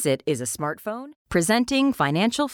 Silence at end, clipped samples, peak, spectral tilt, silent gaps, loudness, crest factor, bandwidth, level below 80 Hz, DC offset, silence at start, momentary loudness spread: 0 s; under 0.1%; -10 dBFS; -4.5 dB/octave; 1.16-1.25 s; -23 LUFS; 14 dB; 18 kHz; -54 dBFS; under 0.1%; 0 s; 11 LU